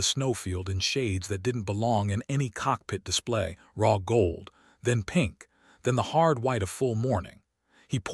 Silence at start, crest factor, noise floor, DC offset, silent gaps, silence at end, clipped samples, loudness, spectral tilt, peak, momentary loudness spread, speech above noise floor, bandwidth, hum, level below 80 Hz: 0 s; 20 dB; -64 dBFS; under 0.1%; none; 0 s; under 0.1%; -28 LUFS; -5 dB/octave; -8 dBFS; 8 LU; 37 dB; 13 kHz; none; -52 dBFS